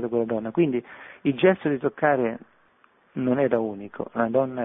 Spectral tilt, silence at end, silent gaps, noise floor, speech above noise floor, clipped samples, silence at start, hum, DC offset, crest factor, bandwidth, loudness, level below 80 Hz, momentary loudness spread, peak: -11 dB/octave; 0 s; none; -61 dBFS; 37 dB; under 0.1%; 0 s; none; under 0.1%; 18 dB; 3.9 kHz; -24 LUFS; -64 dBFS; 12 LU; -6 dBFS